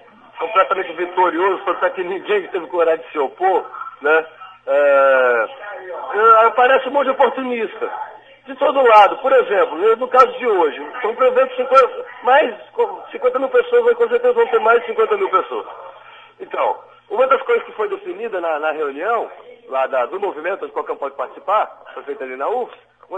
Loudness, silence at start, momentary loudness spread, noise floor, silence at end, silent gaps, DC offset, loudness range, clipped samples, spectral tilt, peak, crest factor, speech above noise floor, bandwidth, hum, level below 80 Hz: -17 LUFS; 0.35 s; 15 LU; -41 dBFS; 0 s; none; under 0.1%; 8 LU; under 0.1%; -4.5 dB/octave; 0 dBFS; 18 dB; 25 dB; 7.8 kHz; none; -66 dBFS